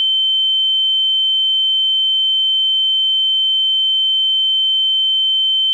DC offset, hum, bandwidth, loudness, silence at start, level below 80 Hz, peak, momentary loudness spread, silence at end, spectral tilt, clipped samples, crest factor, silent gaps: under 0.1%; none; 7.4 kHz; -12 LUFS; 0 s; under -90 dBFS; -12 dBFS; 0 LU; 0 s; 11 dB/octave; under 0.1%; 4 dB; none